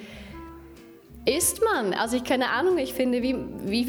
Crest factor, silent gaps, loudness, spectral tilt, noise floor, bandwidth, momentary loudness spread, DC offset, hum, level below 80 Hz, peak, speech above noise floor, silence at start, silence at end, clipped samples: 16 dB; none; -25 LUFS; -3 dB/octave; -47 dBFS; over 20 kHz; 19 LU; under 0.1%; none; -50 dBFS; -10 dBFS; 23 dB; 0 s; 0 s; under 0.1%